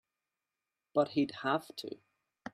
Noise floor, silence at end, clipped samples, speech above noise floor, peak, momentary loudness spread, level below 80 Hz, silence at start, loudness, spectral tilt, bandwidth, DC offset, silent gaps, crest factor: -90 dBFS; 0.05 s; under 0.1%; 56 dB; -16 dBFS; 17 LU; -80 dBFS; 0.95 s; -34 LUFS; -6 dB/octave; 14 kHz; under 0.1%; none; 20 dB